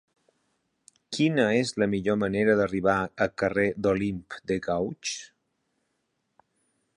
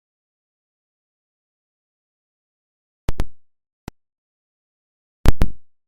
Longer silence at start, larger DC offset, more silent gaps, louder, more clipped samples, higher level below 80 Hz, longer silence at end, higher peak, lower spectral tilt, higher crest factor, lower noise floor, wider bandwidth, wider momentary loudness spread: second, 1.1 s vs 3.1 s; neither; second, none vs 3.73-3.87 s, 4.18-5.24 s; about the same, -26 LUFS vs -26 LUFS; neither; second, -56 dBFS vs -28 dBFS; first, 1.7 s vs 0.25 s; second, -8 dBFS vs 0 dBFS; about the same, -5.5 dB/octave vs -6.5 dB/octave; about the same, 20 dB vs 22 dB; second, -77 dBFS vs under -90 dBFS; second, 11 kHz vs 15.5 kHz; second, 10 LU vs 20 LU